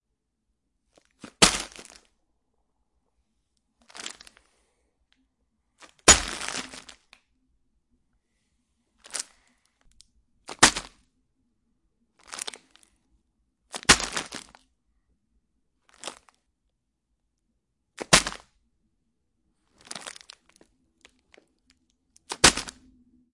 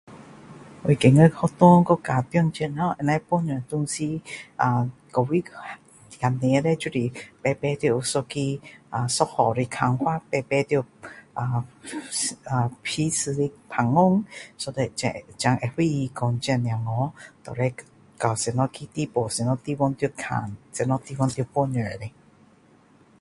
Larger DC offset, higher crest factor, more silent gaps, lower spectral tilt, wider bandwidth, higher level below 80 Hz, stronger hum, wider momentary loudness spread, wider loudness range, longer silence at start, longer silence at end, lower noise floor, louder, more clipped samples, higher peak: neither; first, 32 dB vs 24 dB; neither; second, -1 dB/octave vs -6 dB/octave; about the same, 11.5 kHz vs 11.5 kHz; first, -48 dBFS vs -56 dBFS; neither; first, 23 LU vs 13 LU; first, 22 LU vs 7 LU; first, 1.4 s vs 0.1 s; second, 0.65 s vs 1.1 s; first, -79 dBFS vs -56 dBFS; first, -21 LUFS vs -24 LUFS; neither; about the same, 0 dBFS vs 0 dBFS